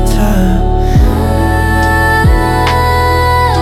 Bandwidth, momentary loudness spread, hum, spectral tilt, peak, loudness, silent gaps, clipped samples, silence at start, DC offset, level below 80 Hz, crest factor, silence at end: 15.5 kHz; 3 LU; none; -6 dB/octave; 0 dBFS; -11 LUFS; none; under 0.1%; 0 s; under 0.1%; -14 dBFS; 8 dB; 0 s